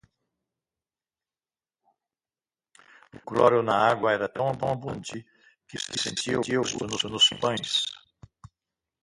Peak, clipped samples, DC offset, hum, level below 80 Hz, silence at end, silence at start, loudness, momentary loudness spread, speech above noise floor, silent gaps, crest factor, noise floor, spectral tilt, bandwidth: -6 dBFS; under 0.1%; under 0.1%; none; -62 dBFS; 1.05 s; 3.15 s; -25 LUFS; 16 LU; over 64 dB; none; 24 dB; under -90 dBFS; -3 dB/octave; 11.5 kHz